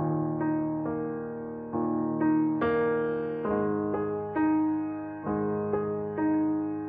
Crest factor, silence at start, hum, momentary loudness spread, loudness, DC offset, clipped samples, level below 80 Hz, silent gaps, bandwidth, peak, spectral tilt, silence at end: 14 dB; 0 s; none; 8 LU; -29 LUFS; under 0.1%; under 0.1%; -60 dBFS; none; 3.7 kHz; -14 dBFS; -8 dB/octave; 0 s